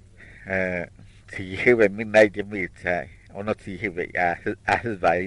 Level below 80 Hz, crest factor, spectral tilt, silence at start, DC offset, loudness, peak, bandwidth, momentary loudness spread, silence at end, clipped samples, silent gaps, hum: -50 dBFS; 22 dB; -6 dB/octave; 0.2 s; under 0.1%; -23 LUFS; -2 dBFS; 11 kHz; 16 LU; 0 s; under 0.1%; none; none